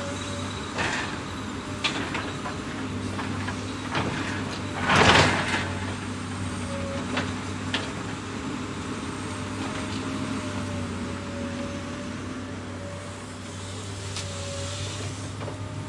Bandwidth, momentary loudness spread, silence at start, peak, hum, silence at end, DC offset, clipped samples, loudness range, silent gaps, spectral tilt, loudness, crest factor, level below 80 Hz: 11.5 kHz; 8 LU; 0 s; -4 dBFS; none; 0 s; under 0.1%; under 0.1%; 10 LU; none; -4 dB/octave; -29 LUFS; 26 dB; -50 dBFS